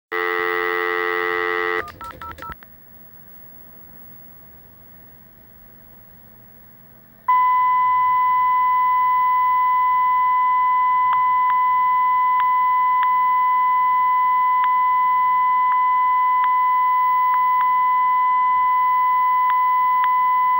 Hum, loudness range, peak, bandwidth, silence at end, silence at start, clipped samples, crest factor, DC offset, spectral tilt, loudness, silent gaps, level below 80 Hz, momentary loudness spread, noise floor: none; 9 LU; -8 dBFS; 16.5 kHz; 0 s; 0.1 s; under 0.1%; 10 dB; under 0.1%; -4.5 dB/octave; -17 LUFS; none; -58 dBFS; 4 LU; -47 dBFS